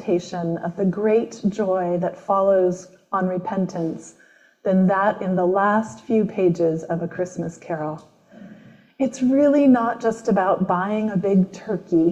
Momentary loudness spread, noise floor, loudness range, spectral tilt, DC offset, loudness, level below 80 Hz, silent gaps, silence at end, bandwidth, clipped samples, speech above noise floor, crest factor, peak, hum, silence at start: 11 LU; -47 dBFS; 4 LU; -8 dB/octave; under 0.1%; -21 LUFS; -62 dBFS; none; 0 s; 8.6 kHz; under 0.1%; 26 dB; 14 dB; -6 dBFS; none; 0 s